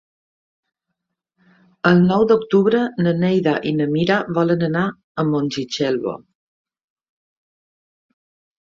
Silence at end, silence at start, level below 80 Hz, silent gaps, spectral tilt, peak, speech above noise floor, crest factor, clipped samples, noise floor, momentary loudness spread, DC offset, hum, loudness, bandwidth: 2.5 s; 1.85 s; -58 dBFS; 5.04-5.15 s; -7 dB/octave; -2 dBFS; 61 dB; 18 dB; under 0.1%; -79 dBFS; 9 LU; under 0.1%; none; -18 LUFS; 7.4 kHz